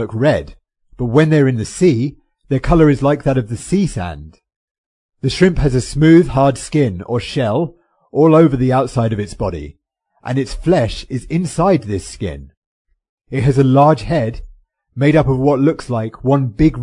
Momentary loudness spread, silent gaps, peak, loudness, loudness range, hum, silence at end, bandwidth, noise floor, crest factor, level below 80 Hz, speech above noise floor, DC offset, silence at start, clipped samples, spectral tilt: 14 LU; 4.56-5.09 s, 12.57-12.85 s, 13.09-13.17 s; 0 dBFS; -15 LUFS; 5 LU; none; 0 s; 11 kHz; -44 dBFS; 16 dB; -32 dBFS; 30 dB; under 0.1%; 0 s; under 0.1%; -7.5 dB/octave